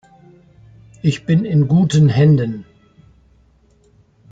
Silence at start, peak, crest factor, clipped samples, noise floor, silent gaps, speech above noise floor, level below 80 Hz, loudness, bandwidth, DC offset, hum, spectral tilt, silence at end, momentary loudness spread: 1.05 s; -4 dBFS; 14 dB; under 0.1%; -54 dBFS; none; 40 dB; -48 dBFS; -15 LUFS; 8 kHz; under 0.1%; none; -7.5 dB/octave; 1.7 s; 10 LU